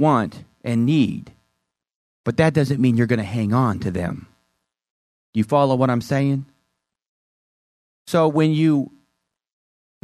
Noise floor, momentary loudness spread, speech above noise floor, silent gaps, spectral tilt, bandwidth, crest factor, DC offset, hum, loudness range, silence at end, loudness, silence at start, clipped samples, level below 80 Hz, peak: -76 dBFS; 12 LU; 57 dB; 1.95-2.24 s, 4.90-5.33 s, 7.08-8.06 s; -7.5 dB/octave; 13.5 kHz; 18 dB; under 0.1%; none; 2 LU; 1.15 s; -20 LUFS; 0 s; under 0.1%; -56 dBFS; -4 dBFS